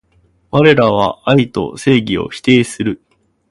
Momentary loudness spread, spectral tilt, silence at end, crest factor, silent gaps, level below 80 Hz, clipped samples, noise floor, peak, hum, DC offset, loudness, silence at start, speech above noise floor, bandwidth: 10 LU; -6 dB/octave; 0.55 s; 14 dB; none; -44 dBFS; under 0.1%; -55 dBFS; 0 dBFS; none; under 0.1%; -13 LUFS; 0.55 s; 42 dB; 11.5 kHz